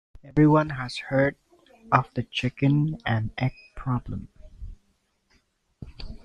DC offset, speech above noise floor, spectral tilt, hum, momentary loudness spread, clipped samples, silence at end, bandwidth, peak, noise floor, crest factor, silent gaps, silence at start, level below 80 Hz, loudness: under 0.1%; 45 dB; -7.5 dB/octave; none; 24 LU; under 0.1%; 0.1 s; 10 kHz; -2 dBFS; -69 dBFS; 24 dB; none; 0.25 s; -46 dBFS; -25 LUFS